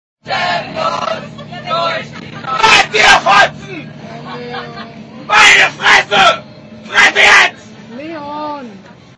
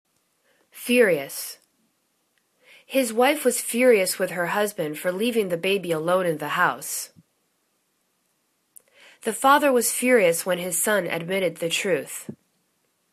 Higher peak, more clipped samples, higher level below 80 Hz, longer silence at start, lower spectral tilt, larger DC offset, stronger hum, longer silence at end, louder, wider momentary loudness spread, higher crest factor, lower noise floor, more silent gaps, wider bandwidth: first, 0 dBFS vs -6 dBFS; first, 0.7% vs under 0.1%; first, -46 dBFS vs -72 dBFS; second, 0.25 s vs 0.75 s; second, -1.5 dB/octave vs -3 dB/octave; neither; neither; second, 0.4 s vs 0.8 s; first, -9 LUFS vs -22 LUFS; first, 22 LU vs 13 LU; second, 12 dB vs 20 dB; second, -36 dBFS vs -71 dBFS; neither; second, 11 kHz vs 14 kHz